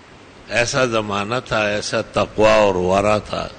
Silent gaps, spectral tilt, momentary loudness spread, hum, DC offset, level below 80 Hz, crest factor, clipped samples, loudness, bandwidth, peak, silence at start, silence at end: none; -4.5 dB/octave; 8 LU; none; under 0.1%; -42 dBFS; 14 dB; under 0.1%; -18 LUFS; 9.6 kHz; -4 dBFS; 0.35 s; 0 s